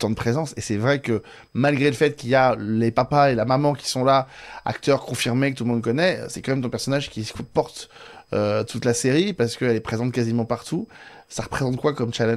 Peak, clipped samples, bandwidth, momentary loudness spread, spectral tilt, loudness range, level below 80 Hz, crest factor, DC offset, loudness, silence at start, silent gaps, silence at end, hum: -4 dBFS; under 0.1%; 14.5 kHz; 11 LU; -5.5 dB/octave; 4 LU; -52 dBFS; 18 dB; under 0.1%; -22 LUFS; 0 s; none; 0 s; none